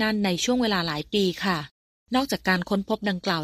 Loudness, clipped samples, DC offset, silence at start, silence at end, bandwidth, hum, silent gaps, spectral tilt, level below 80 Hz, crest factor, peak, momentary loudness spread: -25 LUFS; under 0.1%; under 0.1%; 0 s; 0 s; 15.5 kHz; none; 1.71-2.06 s; -4.5 dB/octave; -54 dBFS; 18 dB; -8 dBFS; 4 LU